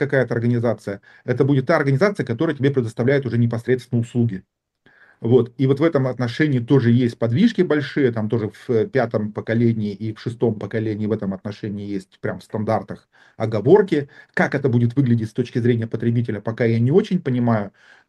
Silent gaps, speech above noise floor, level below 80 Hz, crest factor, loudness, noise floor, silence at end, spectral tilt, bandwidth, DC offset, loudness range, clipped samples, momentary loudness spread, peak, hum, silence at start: none; 36 dB; -62 dBFS; 18 dB; -20 LUFS; -55 dBFS; 0.4 s; -8.5 dB/octave; 9.8 kHz; under 0.1%; 5 LU; under 0.1%; 11 LU; -2 dBFS; none; 0 s